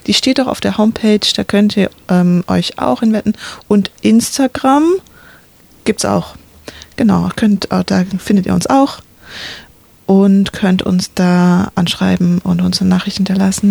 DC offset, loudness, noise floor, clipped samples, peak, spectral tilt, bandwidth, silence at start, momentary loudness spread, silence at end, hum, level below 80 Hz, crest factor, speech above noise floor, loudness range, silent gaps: under 0.1%; -13 LUFS; -44 dBFS; under 0.1%; 0 dBFS; -5.5 dB/octave; 19.5 kHz; 0.05 s; 9 LU; 0 s; none; -44 dBFS; 12 dB; 32 dB; 3 LU; none